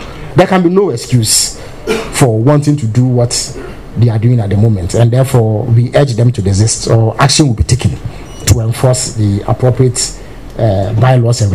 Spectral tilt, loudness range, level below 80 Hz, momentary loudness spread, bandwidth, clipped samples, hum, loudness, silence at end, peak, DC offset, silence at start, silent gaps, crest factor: -5.5 dB/octave; 2 LU; -30 dBFS; 8 LU; 14.5 kHz; 0.2%; none; -11 LUFS; 0 s; 0 dBFS; 1%; 0 s; none; 10 dB